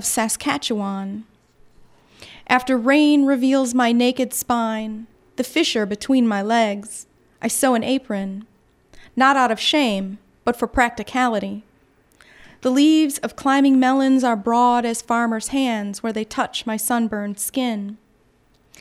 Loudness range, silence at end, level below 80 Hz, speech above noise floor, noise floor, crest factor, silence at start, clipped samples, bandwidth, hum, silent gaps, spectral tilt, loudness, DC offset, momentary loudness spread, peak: 4 LU; 0.85 s; -52 dBFS; 39 dB; -58 dBFS; 18 dB; 0 s; under 0.1%; 16 kHz; none; none; -3.5 dB/octave; -19 LUFS; under 0.1%; 14 LU; -2 dBFS